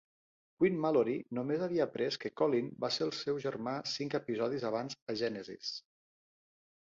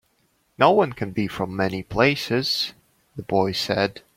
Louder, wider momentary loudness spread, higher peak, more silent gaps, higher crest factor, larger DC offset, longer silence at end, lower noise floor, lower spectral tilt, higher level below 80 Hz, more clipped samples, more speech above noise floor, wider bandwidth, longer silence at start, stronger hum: second, -35 LUFS vs -22 LUFS; about the same, 8 LU vs 9 LU; second, -18 dBFS vs -2 dBFS; first, 5.02-5.06 s vs none; about the same, 18 dB vs 22 dB; neither; first, 1.05 s vs 0.15 s; first, under -90 dBFS vs -66 dBFS; about the same, -5.5 dB/octave vs -5 dB/octave; second, -76 dBFS vs -54 dBFS; neither; first, over 56 dB vs 44 dB; second, 7.6 kHz vs 16.5 kHz; about the same, 0.6 s vs 0.6 s; neither